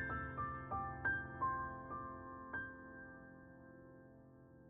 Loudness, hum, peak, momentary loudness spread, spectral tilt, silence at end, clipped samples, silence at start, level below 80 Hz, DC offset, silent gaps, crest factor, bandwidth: -44 LUFS; none; -28 dBFS; 20 LU; -6 dB/octave; 0 s; under 0.1%; 0 s; -62 dBFS; under 0.1%; none; 18 dB; 3.8 kHz